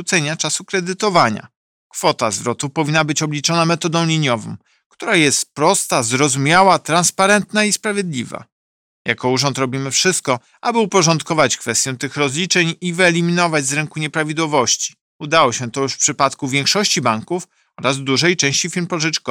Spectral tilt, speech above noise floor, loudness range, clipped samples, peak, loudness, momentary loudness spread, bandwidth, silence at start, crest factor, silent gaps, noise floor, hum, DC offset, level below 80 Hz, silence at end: -3 dB/octave; over 73 dB; 3 LU; under 0.1%; 0 dBFS; -16 LUFS; 8 LU; 17 kHz; 0 s; 16 dB; 1.56-1.90 s, 4.86-4.90 s, 8.52-9.05 s, 15.01-15.19 s; under -90 dBFS; none; under 0.1%; -60 dBFS; 0 s